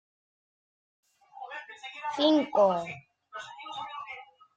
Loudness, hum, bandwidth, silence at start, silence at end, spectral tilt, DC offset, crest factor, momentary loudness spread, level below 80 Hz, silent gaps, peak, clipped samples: -28 LUFS; none; 8.4 kHz; 1.35 s; 0.3 s; -5 dB/octave; under 0.1%; 22 dB; 21 LU; -78 dBFS; none; -10 dBFS; under 0.1%